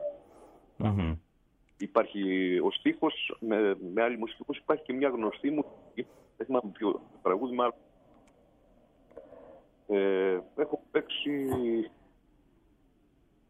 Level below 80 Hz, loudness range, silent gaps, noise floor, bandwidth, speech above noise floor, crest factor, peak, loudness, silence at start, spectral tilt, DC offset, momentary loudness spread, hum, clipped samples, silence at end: -56 dBFS; 4 LU; none; -67 dBFS; 13.5 kHz; 37 dB; 20 dB; -12 dBFS; -31 LUFS; 0 s; -7.5 dB/octave; under 0.1%; 13 LU; none; under 0.1%; 1.6 s